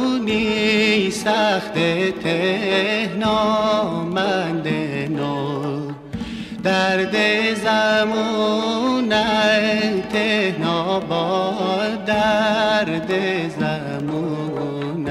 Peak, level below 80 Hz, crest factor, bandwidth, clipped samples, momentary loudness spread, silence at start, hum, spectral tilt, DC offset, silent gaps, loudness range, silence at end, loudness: -6 dBFS; -50 dBFS; 14 dB; 13.5 kHz; under 0.1%; 8 LU; 0 s; none; -5 dB/octave; under 0.1%; none; 3 LU; 0 s; -19 LUFS